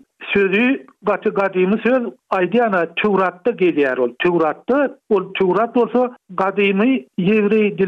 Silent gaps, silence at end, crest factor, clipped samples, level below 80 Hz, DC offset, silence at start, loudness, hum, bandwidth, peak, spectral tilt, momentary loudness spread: none; 0 s; 12 dB; under 0.1%; -60 dBFS; under 0.1%; 0.2 s; -18 LUFS; none; 6 kHz; -6 dBFS; -8 dB/octave; 5 LU